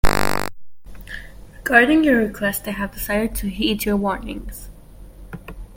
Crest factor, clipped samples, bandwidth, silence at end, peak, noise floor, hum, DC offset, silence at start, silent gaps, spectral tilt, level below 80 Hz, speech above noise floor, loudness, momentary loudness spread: 20 dB; under 0.1%; 17 kHz; 0 s; 0 dBFS; -41 dBFS; none; under 0.1%; 0.05 s; none; -4.5 dB/octave; -32 dBFS; 21 dB; -20 LUFS; 22 LU